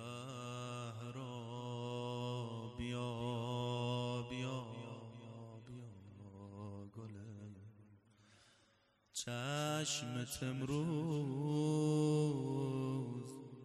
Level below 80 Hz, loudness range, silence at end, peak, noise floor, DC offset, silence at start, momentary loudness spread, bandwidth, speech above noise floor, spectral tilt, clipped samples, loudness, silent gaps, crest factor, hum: -70 dBFS; 16 LU; 0 s; -26 dBFS; -74 dBFS; under 0.1%; 0 s; 17 LU; 13 kHz; 36 dB; -5.5 dB/octave; under 0.1%; -41 LUFS; none; 16 dB; none